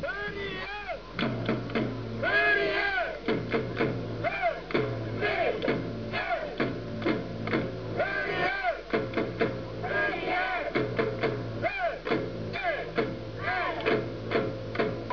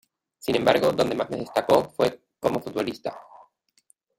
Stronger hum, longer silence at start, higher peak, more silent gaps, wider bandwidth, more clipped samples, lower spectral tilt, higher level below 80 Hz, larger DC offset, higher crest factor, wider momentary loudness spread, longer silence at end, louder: neither; second, 0 s vs 0.45 s; second, -12 dBFS vs -6 dBFS; neither; second, 5.4 kHz vs 16.5 kHz; neither; first, -7 dB/octave vs -5 dB/octave; first, -52 dBFS vs -60 dBFS; first, 0.2% vs under 0.1%; about the same, 18 dB vs 20 dB; second, 6 LU vs 14 LU; second, 0 s vs 0.95 s; second, -30 LUFS vs -24 LUFS